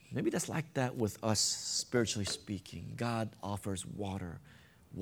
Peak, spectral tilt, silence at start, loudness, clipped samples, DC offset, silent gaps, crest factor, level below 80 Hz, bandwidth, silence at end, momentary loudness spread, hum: -16 dBFS; -4 dB/octave; 0.05 s; -35 LUFS; under 0.1%; under 0.1%; none; 20 dB; -64 dBFS; 18 kHz; 0 s; 12 LU; none